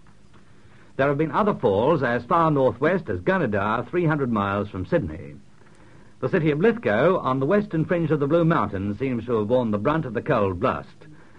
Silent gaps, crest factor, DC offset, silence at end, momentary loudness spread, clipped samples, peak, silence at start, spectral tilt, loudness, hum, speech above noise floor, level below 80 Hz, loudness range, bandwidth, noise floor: none; 16 dB; 0.4%; 0.25 s; 7 LU; under 0.1%; -6 dBFS; 1 s; -9 dB/octave; -23 LUFS; none; 31 dB; -52 dBFS; 3 LU; 7.8 kHz; -53 dBFS